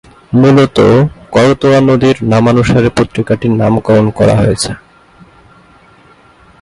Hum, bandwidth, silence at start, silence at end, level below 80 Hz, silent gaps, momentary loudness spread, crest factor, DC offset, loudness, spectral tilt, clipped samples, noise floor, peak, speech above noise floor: none; 11.5 kHz; 0.3 s; 1.85 s; -34 dBFS; none; 6 LU; 10 dB; under 0.1%; -10 LUFS; -6.5 dB/octave; under 0.1%; -43 dBFS; 0 dBFS; 34 dB